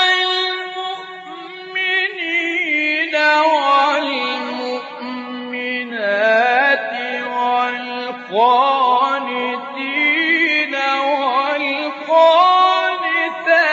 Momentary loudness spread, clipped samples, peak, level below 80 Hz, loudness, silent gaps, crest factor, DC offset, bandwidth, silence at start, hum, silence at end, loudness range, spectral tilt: 12 LU; under 0.1%; -2 dBFS; -80 dBFS; -16 LUFS; none; 16 dB; under 0.1%; 8 kHz; 0 s; none; 0 s; 3 LU; 2 dB/octave